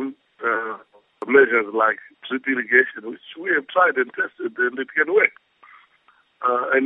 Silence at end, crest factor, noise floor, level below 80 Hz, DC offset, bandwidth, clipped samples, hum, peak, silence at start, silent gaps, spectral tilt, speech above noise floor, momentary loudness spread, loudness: 0 s; 20 dB; -59 dBFS; -78 dBFS; under 0.1%; 3.9 kHz; under 0.1%; none; -2 dBFS; 0 s; none; -7 dB/octave; 39 dB; 15 LU; -20 LUFS